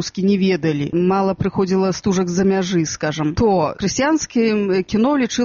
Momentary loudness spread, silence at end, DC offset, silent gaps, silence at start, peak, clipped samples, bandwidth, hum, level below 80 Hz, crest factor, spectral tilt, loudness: 3 LU; 0 s; under 0.1%; none; 0 s; -4 dBFS; under 0.1%; 7.4 kHz; none; -44 dBFS; 12 dB; -5.5 dB/octave; -18 LUFS